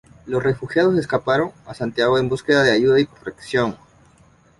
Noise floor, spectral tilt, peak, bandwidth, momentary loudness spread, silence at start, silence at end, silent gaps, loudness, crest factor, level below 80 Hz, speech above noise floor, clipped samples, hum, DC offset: -53 dBFS; -6 dB/octave; -2 dBFS; 11.5 kHz; 11 LU; 0.25 s; 0.85 s; none; -19 LUFS; 18 dB; -52 dBFS; 34 dB; under 0.1%; none; under 0.1%